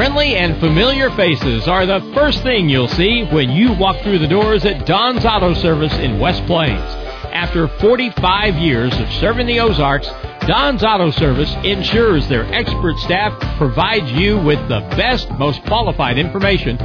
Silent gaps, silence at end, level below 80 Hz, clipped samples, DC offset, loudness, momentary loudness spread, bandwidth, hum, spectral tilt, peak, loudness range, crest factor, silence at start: none; 0 s; -26 dBFS; under 0.1%; under 0.1%; -15 LUFS; 5 LU; 5.4 kHz; none; -7 dB/octave; -2 dBFS; 2 LU; 12 dB; 0 s